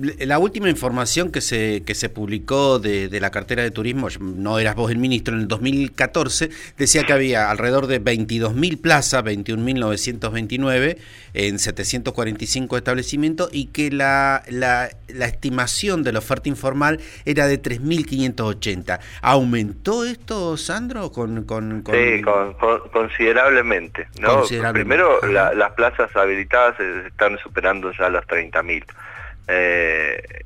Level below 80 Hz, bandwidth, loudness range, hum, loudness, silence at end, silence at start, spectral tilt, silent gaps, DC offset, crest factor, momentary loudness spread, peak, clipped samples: -40 dBFS; 16.5 kHz; 5 LU; none; -19 LUFS; 0 s; 0 s; -4 dB/octave; none; under 0.1%; 18 dB; 9 LU; -2 dBFS; under 0.1%